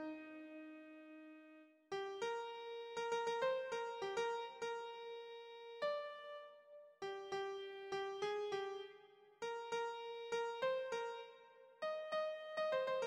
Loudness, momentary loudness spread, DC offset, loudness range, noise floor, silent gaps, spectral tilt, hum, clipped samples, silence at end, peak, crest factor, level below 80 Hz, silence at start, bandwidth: -45 LUFS; 17 LU; under 0.1%; 4 LU; -65 dBFS; none; -3 dB/octave; none; under 0.1%; 0 s; -28 dBFS; 18 dB; -88 dBFS; 0 s; 11.5 kHz